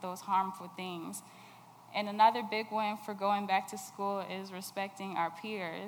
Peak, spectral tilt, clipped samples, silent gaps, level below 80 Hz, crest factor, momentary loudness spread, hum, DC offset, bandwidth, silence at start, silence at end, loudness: -14 dBFS; -4 dB/octave; under 0.1%; none; under -90 dBFS; 22 dB; 15 LU; none; under 0.1%; over 20 kHz; 0 s; 0 s; -34 LUFS